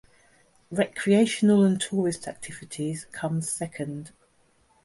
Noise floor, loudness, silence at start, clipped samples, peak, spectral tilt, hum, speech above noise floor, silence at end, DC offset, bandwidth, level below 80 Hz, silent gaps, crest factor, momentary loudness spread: -64 dBFS; -25 LUFS; 0.7 s; under 0.1%; -10 dBFS; -5.5 dB/octave; none; 39 dB; 0.75 s; under 0.1%; 11.5 kHz; -64 dBFS; none; 18 dB; 16 LU